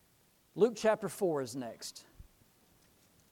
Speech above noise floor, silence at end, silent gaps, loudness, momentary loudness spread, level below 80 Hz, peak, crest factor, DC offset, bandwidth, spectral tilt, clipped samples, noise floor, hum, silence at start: 36 dB; 1.1 s; none; -34 LUFS; 17 LU; -68 dBFS; -16 dBFS; 20 dB; under 0.1%; 19 kHz; -5 dB/octave; under 0.1%; -69 dBFS; none; 0.55 s